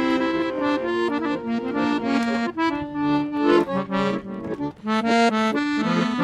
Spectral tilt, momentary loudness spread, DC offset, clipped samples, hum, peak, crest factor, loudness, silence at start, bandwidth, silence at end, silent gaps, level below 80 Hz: -6 dB/octave; 6 LU; under 0.1%; under 0.1%; none; -6 dBFS; 16 dB; -23 LUFS; 0 s; 11.5 kHz; 0 s; none; -56 dBFS